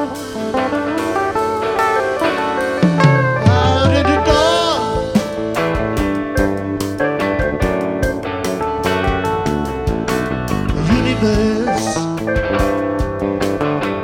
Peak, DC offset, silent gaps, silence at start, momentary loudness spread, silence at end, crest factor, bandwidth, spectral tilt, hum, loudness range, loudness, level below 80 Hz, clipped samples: 0 dBFS; under 0.1%; none; 0 s; 7 LU; 0 s; 16 dB; 17.5 kHz; -6 dB/octave; none; 4 LU; -17 LUFS; -30 dBFS; under 0.1%